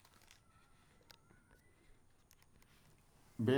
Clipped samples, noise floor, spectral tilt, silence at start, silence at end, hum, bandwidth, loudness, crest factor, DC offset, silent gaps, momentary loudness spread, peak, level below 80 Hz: under 0.1%; -68 dBFS; -7 dB/octave; 3.4 s; 0 s; none; 19.5 kHz; -49 LUFS; 24 dB; under 0.1%; none; 10 LU; -20 dBFS; -72 dBFS